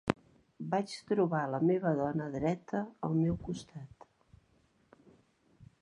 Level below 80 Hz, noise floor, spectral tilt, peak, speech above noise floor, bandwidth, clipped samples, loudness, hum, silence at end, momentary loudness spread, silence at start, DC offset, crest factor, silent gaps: -60 dBFS; -70 dBFS; -7.5 dB/octave; -8 dBFS; 37 dB; 11 kHz; under 0.1%; -34 LUFS; none; 0.15 s; 14 LU; 0.05 s; under 0.1%; 26 dB; none